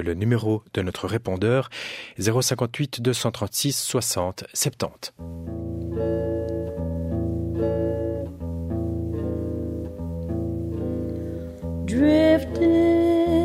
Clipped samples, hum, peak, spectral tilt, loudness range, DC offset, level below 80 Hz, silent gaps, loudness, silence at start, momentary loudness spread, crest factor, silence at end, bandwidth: under 0.1%; none; -6 dBFS; -5.5 dB/octave; 6 LU; under 0.1%; -40 dBFS; none; -25 LUFS; 0 s; 13 LU; 18 dB; 0 s; 16 kHz